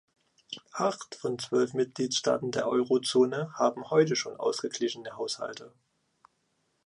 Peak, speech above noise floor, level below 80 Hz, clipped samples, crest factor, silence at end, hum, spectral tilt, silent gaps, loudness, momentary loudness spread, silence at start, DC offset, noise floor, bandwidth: -12 dBFS; 46 dB; -76 dBFS; under 0.1%; 18 dB; 1.2 s; none; -4 dB/octave; none; -29 LUFS; 11 LU; 0.5 s; under 0.1%; -75 dBFS; 11.5 kHz